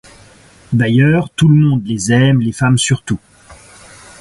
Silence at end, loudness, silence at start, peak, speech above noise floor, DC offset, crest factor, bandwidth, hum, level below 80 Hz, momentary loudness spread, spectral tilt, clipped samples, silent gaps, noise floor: 0.65 s; -13 LUFS; 0.7 s; 0 dBFS; 32 dB; under 0.1%; 14 dB; 11.5 kHz; none; -42 dBFS; 8 LU; -5.5 dB/octave; under 0.1%; none; -44 dBFS